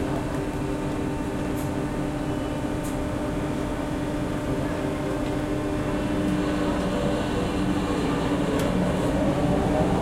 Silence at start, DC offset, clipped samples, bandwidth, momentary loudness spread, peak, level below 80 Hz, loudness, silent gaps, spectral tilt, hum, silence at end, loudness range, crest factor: 0 s; under 0.1%; under 0.1%; 16 kHz; 5 LU; -10 dBFS; -36 dBFS; -26 LUFS; none; -6.5 dB/octave; none; 0 s; 4 LU; 14 dB